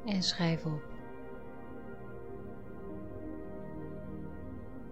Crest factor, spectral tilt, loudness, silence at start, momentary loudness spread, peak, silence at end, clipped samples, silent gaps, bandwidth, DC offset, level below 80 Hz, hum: 22 dB; -5 dB/octave; -40 LUFS; 0 s; 16 LU; -18 dBFS; 0 s; under 0.1%; none; 8.8 kHz; 0.5%; -56 dBFS; none